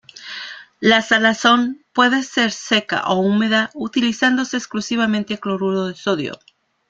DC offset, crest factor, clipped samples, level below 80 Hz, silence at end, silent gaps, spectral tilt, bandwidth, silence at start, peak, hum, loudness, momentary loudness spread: under 0.1%; 18 dB; under 0.1%; -60 dBFS; 0.55 s; none; -4 dB/octave; 7.8 kHz; 0.15 s; 0 dBFS; none; -18 LUFS; 10 LU